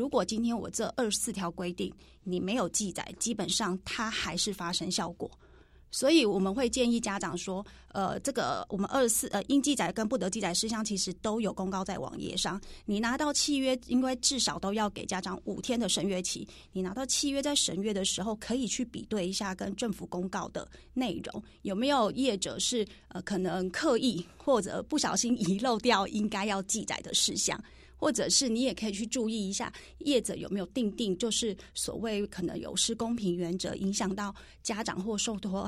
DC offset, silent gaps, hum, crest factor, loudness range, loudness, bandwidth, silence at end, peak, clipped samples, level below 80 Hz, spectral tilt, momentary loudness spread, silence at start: under 0.1%; none; none; 20 dB; 3 LU; -31 LUFS; 15.5 kHz; 0 s; -10 dBFS; under 0.1%; -56 dBFS; -3 dB/octave; 9 LU; 0 s